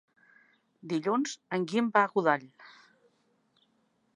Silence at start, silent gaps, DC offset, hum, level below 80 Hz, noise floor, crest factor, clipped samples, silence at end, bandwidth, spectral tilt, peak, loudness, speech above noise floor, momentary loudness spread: 0.85 s; none; under 0.1%; none; -86 dBFS; -72 dBFS; 24 dB; under 0.1%; 1.45 s; 10.5 kHz; -5 dB/octave; -10 dBFS; -29 LUFS; 43 dB; 8 LU